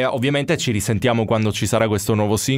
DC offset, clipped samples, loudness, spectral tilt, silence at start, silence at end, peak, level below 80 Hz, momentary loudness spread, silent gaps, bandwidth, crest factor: under 0.1%; under 0.1%; -19 LUFS; -5 dB/octave; 0 s; 0 s; -4 dBFS; -46 dBFS; 1 LU; none; 16 kHz; 16 dB